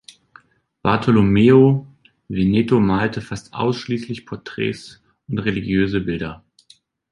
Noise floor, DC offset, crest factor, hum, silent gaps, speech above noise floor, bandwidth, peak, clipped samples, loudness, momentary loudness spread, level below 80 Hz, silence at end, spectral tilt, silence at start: -54 dBFS; under 0.1%; 18 dB; none; none; 37 dB; 11 kHz; -2 dBFS; under 0.1%; -18 LUFS; 17 LU; -44 dBFS; 0.75 s; -8 dB/octave; 0.85 s